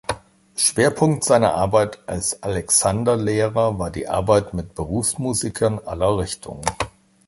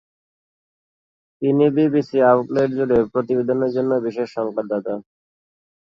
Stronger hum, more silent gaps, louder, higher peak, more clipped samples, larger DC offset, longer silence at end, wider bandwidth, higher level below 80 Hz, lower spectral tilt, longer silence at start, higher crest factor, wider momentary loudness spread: neither; neither; about the same, -20 LUFS vs -19 LUFS; about the same, -2 dBFS vs -4 dBFS; neither; neither; second, 0.4 s vs 0.9 s; first, 12 kHz vs 7.4 kHz; first, -42 dBFS vs -58 dBFS; second, -4.5 dB/octave vs -9 dB/octave; second, 0.1 s vs 1.4 s; about the same, 18 dB vs 16 dB; first, 12 LU vs 9 LU